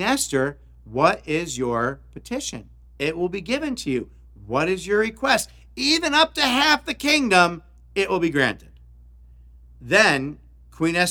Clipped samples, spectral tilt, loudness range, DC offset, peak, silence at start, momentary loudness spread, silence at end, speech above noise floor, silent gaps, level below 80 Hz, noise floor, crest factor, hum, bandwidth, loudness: under 0.1%; -3.5 dB/octave; 7 LU; under 0.1%; -2 dBFS; 0 s; 15 LU; 0 s; 26 dB; none; -48 dBFS; -47 dBFS; 22 dB; none; 19.5 kHz; -21 LUFS